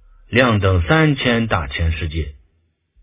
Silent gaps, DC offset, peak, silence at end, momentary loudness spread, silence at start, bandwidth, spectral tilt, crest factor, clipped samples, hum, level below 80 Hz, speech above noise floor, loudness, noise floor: none; under 0.1%; 0 dBFS; 0.7 s; 11 LU; 0.3 s; 4 kHz; -10 dB/octave; 18 dB; under 0.1%; none; -28 dBFS; 47 dB; -17 LUFS; -64 dBFS